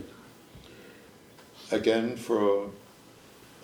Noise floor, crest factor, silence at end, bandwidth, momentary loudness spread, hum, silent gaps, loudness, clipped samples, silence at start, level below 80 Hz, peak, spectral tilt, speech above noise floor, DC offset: -53 dBFS; 20 dB; 0.85 s; over 20 kHz; 25 LU; none; none; -28 LUFS; under 0.1%; 0 s; -66 dBFS; -10 dBFS; -5 dB/octave; 27 dB; under 0.1%